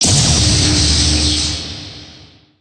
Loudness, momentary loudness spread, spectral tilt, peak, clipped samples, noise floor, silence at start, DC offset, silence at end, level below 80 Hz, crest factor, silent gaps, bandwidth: -12 LUFS; 16 LU; -3 dB/octave; -2 dBFS; under 0.1%; -42 dBFS; 0 s; under 0.1%; 0.45 s; -24 dBFS; 12 dB; none; 10.5 kHz